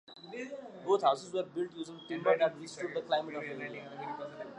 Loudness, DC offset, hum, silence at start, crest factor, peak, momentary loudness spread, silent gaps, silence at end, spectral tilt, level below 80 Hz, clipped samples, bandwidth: -35 LUFS; under 0.1%; none; 0.1 s; 20 dB; -14 dBFS; 14 LU; none; 0 s; -4.5 dB/octave; -82 dBFS; under 0.1%; 11 kHz